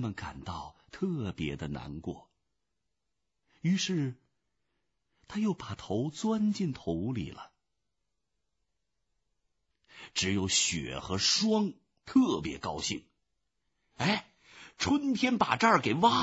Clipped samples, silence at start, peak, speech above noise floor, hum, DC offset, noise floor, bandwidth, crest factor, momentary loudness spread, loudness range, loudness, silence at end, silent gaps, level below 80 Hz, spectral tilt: under 0.1%; 0 s; -10 dBFS; 55 dB; none; under 0.1%; -86 dBFS; 8 kHz; 22 dB; 15 LU; 10 LU; -31 LUFS; 0 s; none; -58 dBFS; -4 dB/octave